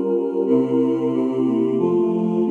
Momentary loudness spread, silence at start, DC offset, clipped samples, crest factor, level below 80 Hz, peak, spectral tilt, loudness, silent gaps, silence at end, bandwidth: 3 LU; 0 s; under 0.1%; under 0.1%; 12 dB; -72 dBFS; -6 dBFS; -10 dB/octave; -20 LUFS; none; 0 s; 6.6 kHz